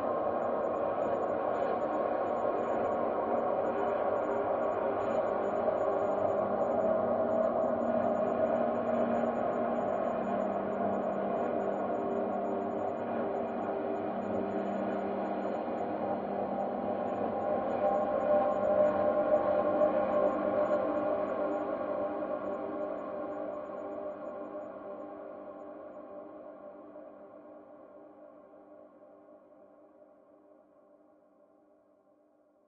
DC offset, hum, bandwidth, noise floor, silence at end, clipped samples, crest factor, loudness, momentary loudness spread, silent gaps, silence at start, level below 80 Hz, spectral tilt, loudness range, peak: under 0.1%; none; 7 kHz; -67 dBFS; 3.05 s; under 0.1%; 18 dB; -32 LUFS; 16 LU; none; 0 s; -68 dBFS; -6 dB/octave; 15 LU; -16 dBFS